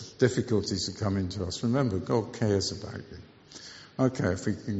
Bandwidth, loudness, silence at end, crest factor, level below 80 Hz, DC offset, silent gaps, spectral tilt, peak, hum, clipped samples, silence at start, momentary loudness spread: 8 kHz; -29 LUFS; 0 s; 20 dB; -56 dBFS; under 0.1%; none; -6 dB/octave; -10 dBFS; none; under 0.1%; 0 s; 17 LU